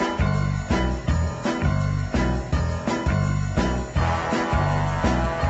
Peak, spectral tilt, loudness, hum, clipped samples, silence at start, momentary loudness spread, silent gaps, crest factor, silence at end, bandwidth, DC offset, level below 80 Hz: -8 dBFS; -6.5 dB/octave; -24 LUFS; none; under 0.1%; 0 s; 2 LU; none; 16 dB; 0 s; 8.2 kHz; under 0.1%; -30 dBFS